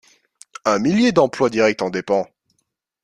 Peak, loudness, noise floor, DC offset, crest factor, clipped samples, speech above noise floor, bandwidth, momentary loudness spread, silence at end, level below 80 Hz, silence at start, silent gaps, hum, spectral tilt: -2 dBFS; -18 LUFS; -72 dBFS; under 0.1%; 18 dB; under 0.1%; 55 dB; 11 kHz; 8 LU; 0.8 s; -58 dBFS; 0.65 s; none; none; -5.5 dB/octave